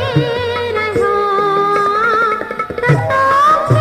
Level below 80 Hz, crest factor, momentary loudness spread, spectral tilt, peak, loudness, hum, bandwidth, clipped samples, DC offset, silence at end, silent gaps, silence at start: -44 dBFS; 14 dB; 7 LU; -6.5 dB/octave; 0 dBFS; -14 LUFS; none; 15 kHz; under 0.1%; under 0.1%; 0 s; none; 0 s